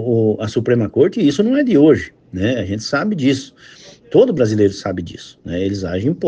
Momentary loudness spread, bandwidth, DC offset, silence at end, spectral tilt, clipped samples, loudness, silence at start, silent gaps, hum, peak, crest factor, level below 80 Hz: 13 LU; 8.8 kHz; under 0.1%; 0 s; -7 dB/octave; under 0.1%; -16 LUFS; 0 s; none; none; 0 dBFS; 16 dB; -52 dBFS